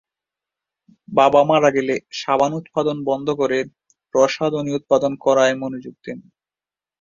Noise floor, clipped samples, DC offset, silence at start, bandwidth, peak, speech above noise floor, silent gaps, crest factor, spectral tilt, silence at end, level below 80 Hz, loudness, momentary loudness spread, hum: under -90 dBFS; under 0.1%; under 0.1%; 1.1 s; 7.6 kHz; -2 dBFS; over 72 dB; none; 18 dB; -5 dB/octave; 0.8 s; -62 dBFS; -19 LUFS; 17 LU; none